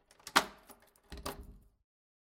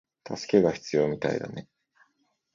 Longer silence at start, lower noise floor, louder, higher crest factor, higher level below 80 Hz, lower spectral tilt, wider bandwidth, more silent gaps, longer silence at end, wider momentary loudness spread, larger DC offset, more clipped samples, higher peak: about the same, 0.25 s vs 0.25 s; second, -61 dBFS vs -73 dBFS; second, -35 LUFS vs -26 LUFS; first, 34 dB vs 22 dB; about the same, -58 dBFS vs -62 dBFS; second, -1.5 dB/octave vs -6 dB/octave; first, 17 kHz vs 7.6 kHz; neither; second, 0.65 s vs 0.95 s; first, 21 LU vs 16 LU; neither; neither; about the same, -6 dBFS vs -8 dBFS